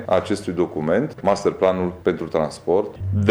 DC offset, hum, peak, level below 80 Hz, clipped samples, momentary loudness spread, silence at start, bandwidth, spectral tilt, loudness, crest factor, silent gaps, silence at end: under 0.1%; none; -4 dBFS; -50 dBFS; under 0.1%; 4 LU; 0 s; 12 kHz; -7 dB/octave; -22 LUFS; 16 dB; none; 0 s